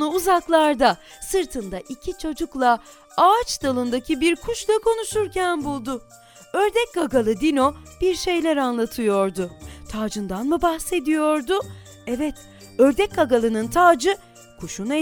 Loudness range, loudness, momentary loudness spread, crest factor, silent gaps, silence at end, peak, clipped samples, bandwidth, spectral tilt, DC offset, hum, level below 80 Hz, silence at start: 3 LU; -21 LUFS; 13 LU; 18 dB; none; 0 s; -4 dBFS; under 0.1%; 18 kHz; -4 dB/octave; under 0.1%; none; -46 dBFS; 0 s